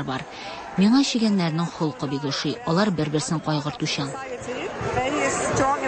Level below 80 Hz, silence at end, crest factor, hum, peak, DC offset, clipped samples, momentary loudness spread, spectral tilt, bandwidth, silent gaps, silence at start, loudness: -50 dBFS; 0 s; 16 dB; none; -8 dBFS; under 0.1%; under 0.1%; 11 LU; -5 dB/octave; 8.8 kHz; none; 0 s; -24 LUFS